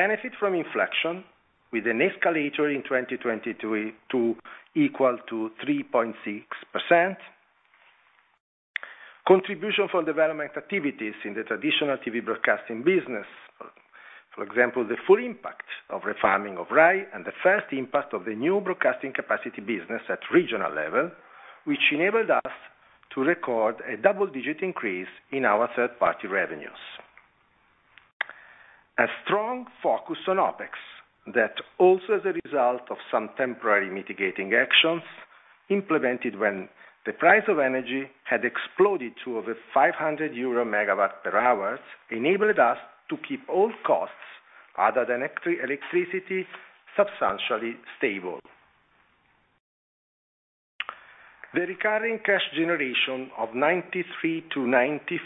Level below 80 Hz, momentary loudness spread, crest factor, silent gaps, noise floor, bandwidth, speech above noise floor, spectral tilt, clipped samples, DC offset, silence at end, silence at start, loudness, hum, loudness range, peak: -74 dBFS; 14 LU; 24 dB; 8.40-8.74 s, 28.13-28.20 s, 49.60-50.79 s; -66 dBFS; 4 kHz; 40 dB; -7.5 dB/octave; under 0.1%; under 0.1%; 0 s; 0 s; -25 LUFS; none; 5 LU; -2 dBFS